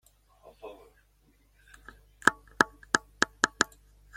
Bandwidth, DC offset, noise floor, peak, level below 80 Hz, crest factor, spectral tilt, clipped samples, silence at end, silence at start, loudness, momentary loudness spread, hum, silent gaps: 16.5 kHz; under 0.1%; -65 dBFS; -2 dBFS; -60 dBFS; 32 dB; -1.5 dB/octave; under 0.1%; 0.5 s; 0.65 s; -28 LUFS; 21 LU; 50 Hz at -60 dBFS; none